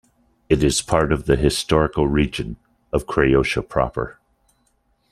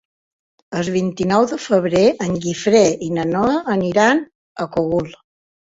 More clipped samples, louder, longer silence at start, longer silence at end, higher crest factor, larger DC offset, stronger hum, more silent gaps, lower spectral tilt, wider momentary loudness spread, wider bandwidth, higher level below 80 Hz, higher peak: neither; about the same, -20 LUFS vs -18 LUFS; second, 0.5 s vs 0.7 s; first, 1 s vs 0.6 s; about the same, 20 dB vs 16 dB; neither; neither; second, none vs 4.35-4.55 s; about the same, -5 dB/octave vs -5.5 dB/octave; about the same, 12 LU vs 10 LU; first, 14 kHz vs 8 kHz; first, -34 dBFS vs -52 dBFS; about the same, -2 dBFS vs -2 dBFS